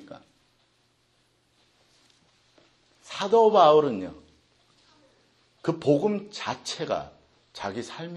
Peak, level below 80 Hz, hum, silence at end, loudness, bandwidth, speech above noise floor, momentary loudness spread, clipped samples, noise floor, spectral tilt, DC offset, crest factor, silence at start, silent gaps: -6 dBFS; -68 dBFS; none; 0 s; -24 LUFS; 10.5 kHz; 44 dB; 20 LU; under 0.1%; -67 dBFS; -5.5 dB/octave; under 0.1%; 22 dB; 0.1 s; none